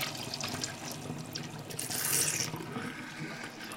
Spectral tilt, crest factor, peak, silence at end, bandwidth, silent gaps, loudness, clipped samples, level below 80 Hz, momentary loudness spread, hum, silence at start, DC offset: -2 dB/octave; 24 dB; -12 dBFS; 0 s; 17 kHz; none; -34 LUFS; under 0.1%; -68 dBFS; 13 LU; none; 0 s; under 0.1%